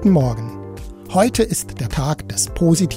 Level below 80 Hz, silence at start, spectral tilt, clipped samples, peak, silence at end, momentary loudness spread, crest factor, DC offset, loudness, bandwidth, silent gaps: -34 dBFS; 0 s; -5.5 dB/octave; under 0.1%; -2 dBFS; 0 s; 16 LU; 16 dB; under 0.1%; -19 LUFS; 16 kHz; none